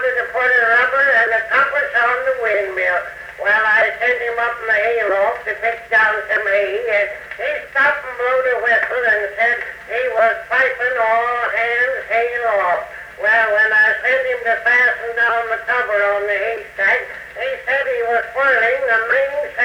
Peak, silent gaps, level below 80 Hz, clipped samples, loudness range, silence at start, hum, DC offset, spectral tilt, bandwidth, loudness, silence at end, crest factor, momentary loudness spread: -4 dBFS; none; -54 dBFS; under 0.1%; 2 LU; 0 s; none; under 0.1%; -3 dB/octave; 17 kHz; -16 LUFS; 0 s; 12 dB; 8 LU